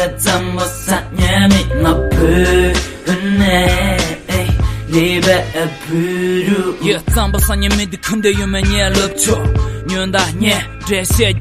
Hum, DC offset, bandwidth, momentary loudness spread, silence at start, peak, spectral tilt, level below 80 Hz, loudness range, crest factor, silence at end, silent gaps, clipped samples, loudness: none; under 0.1%; 15.5 kHz; 7 LU; 0 s; 0 dBFS; -4.5 dB/octave; -22 dBFS; 2 LU; 14 dB; 0 s; none; under 0.1%; -14 LUFS